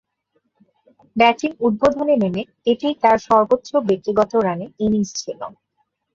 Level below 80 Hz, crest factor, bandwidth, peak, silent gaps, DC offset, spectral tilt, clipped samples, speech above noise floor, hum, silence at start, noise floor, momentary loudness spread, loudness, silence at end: -54 dBFS; 18 dB; 7.6 kHz; -2 dBFS; none; under 0.1%; -5.5 dB/octave; under 0.1%; 52 dB; none; 1.15 s; -70 dBFS; 10 LU; -18 LUFS; 0.65 s